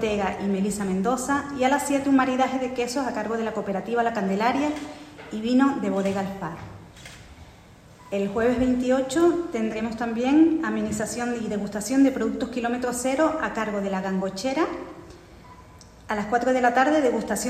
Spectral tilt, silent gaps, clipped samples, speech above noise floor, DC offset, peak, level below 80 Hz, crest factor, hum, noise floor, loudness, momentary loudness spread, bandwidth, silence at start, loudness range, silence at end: -5 dB/octave; none; under 0.1%; 25 dB; under 0.1%; -8 dBFS; -52 dBFS; 16 dB; none; -49 dBFS; -24 LUFS; 11 LU; 14.5 kHz; 0 s; 4 LU; 0 s